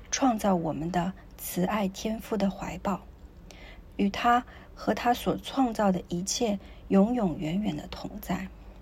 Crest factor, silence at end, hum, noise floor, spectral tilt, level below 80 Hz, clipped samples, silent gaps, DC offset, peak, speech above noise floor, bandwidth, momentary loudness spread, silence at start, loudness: 18 dB; 0 s; none; -48 dBFS; -5 dB/octave; -48 dBFS; under 0.1%; none; under 0.1%; -12 dBFS; 20 dB; 16 kHz; 14 LU; 0 s; -29 LUFS